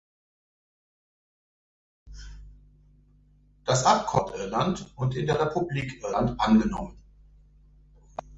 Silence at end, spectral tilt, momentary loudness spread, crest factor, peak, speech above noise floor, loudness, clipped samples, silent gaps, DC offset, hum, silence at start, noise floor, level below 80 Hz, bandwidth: 0 s; -5.5 dB/octave; 21 LU; 22 dB; -8 dBFS; 34 dB; -26 LUFS; under 0.1%; none; under 0.1%; 50 Hz at -55 dBFS; 2.05 s; -59 dBFS; -48 dBFS; 8 kHz